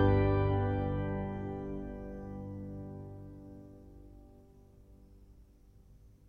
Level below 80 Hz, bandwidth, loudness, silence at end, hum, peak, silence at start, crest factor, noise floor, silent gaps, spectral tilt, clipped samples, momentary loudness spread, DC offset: -46 dBFS; 4.9 kHz; -35 LUFS; 0.2 s; none; -16 dBFS; 0 s; 20 dB; -59 dBFS; none; -10 dB/octave; under 0.1%; 25 LU; under 0.1%